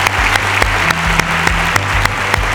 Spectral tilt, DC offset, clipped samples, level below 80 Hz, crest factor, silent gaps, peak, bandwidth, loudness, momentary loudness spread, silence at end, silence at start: -3 dB/octave; under 0.1%; under 0.1%; -24 dBFS; 14 dB; none; 0 dBFS; 19.5 kHz; -13 LUFS; 2 LU; 0 s; 0 s